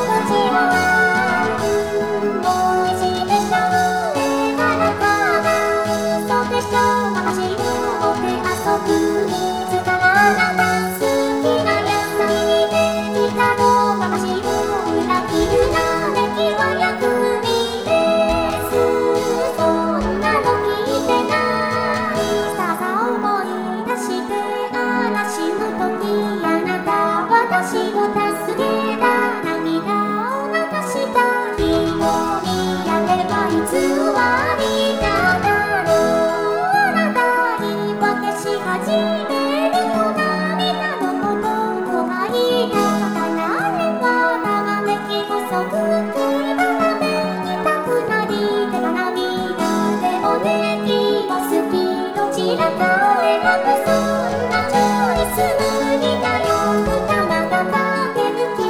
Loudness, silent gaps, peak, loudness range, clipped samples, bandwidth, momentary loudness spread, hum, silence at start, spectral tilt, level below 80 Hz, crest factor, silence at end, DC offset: -18 LUFS; none; -2 dBFS; 2 LU; under 0.1%; over 20 kHz; 5 LU; none; 0 s; -4.5 dB/octave; -44 dBFS; 16 dB; 0 s; 0.3%